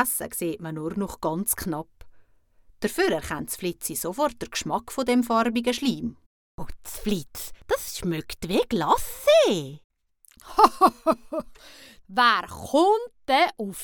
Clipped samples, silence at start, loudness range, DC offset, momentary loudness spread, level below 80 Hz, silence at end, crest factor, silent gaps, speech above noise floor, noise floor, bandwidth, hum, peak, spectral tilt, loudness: under 0.1%; 0 s; 6 LU; under 0.1%; 15 LU; -50 dBFS; 0 s; 22 dB; 6.26-6.58 s, 9.84-9.90 s; 32 dB; -57 dBFS; 19 kHz; none; -2 dBFS; -4 dB/octave; -24 LUFS